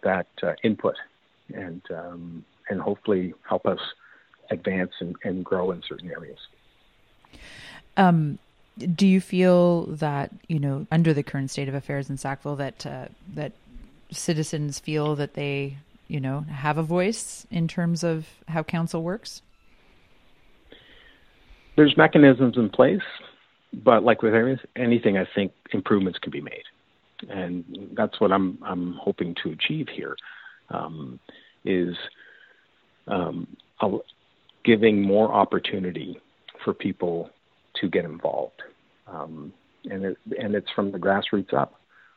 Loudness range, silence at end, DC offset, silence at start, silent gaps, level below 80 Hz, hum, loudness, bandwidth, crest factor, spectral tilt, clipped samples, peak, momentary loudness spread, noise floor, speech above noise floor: 11 LU; 0.5 s; under 0.1%; 0.05 s; none; -60 dBFS; none; -24 LUFS; 12.5 kHz; 24 dB; -6.5 dB/octave; under 0.1%; -2 dBFS; 19 LU; -63 dBFS; 39 dB